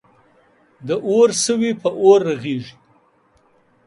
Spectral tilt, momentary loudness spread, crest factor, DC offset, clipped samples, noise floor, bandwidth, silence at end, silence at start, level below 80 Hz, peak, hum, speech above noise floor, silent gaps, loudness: -4.5 dB/octave; 14 LU; 18 dB; under 0.1%; under 0.1%; -58 dBFS; 11.5 kHz; 1.15 s; 0.8 s; -66 dBFS; 0 dBFS; none; 41 dB; none; -17 LUFS